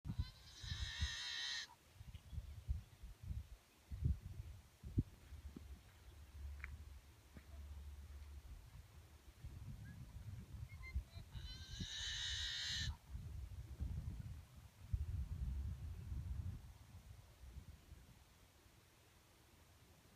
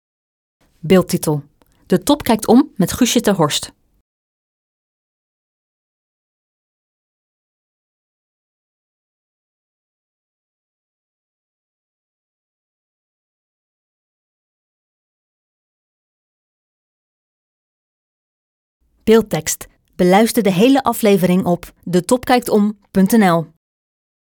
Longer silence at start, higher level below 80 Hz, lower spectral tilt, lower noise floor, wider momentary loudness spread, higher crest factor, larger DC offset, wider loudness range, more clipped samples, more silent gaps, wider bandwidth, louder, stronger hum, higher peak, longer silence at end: second, 0.05 s vs 0.85 s; about the same, -54 dBFS vs -50 dBFS; second, -3.5 dB/octave vs -5 dB/octave; second, -69 dBFS vs under -90 dBFS; first, 20 LU vs 9 LU; about the same, 24 dB vs 20 dB; neither; first, 11 LU vs 7 LU; neither; second, none vs 4.01-18.80 s; second, 15.5 kHz vs 19.5 kHz; second, -49 LUFS vs -15 LUFS; neither; second, -26 dBFS vs 0 dBFS; second, 0 s vs 0.85 s